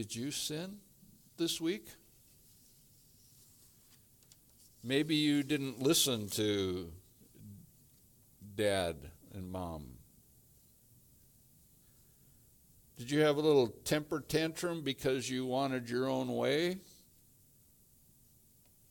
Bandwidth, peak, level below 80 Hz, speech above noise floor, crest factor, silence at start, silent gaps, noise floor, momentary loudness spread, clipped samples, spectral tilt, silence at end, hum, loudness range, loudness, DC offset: 18 kHz; -18 dBFS; -68 dBFS; 31 dB; 20 dB; 0 s; none; -65 dBFS; 20 LU; under 0.1%; -4 dB/octave; 2.05 s; none; 10 LU; -34 LUFS; under 0.1%